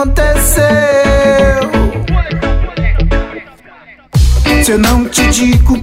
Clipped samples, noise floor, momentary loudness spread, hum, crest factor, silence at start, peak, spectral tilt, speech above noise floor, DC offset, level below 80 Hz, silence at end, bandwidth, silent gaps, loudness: under 0.1%; -38 dBFS; 7 LU; none; 10 dB; 0 s; 0 dBFS; -5 dB/octave; 30 dB; under 0.1%; -14 dBFS; 0 s; 16.5 kHz; none; -11 LUFS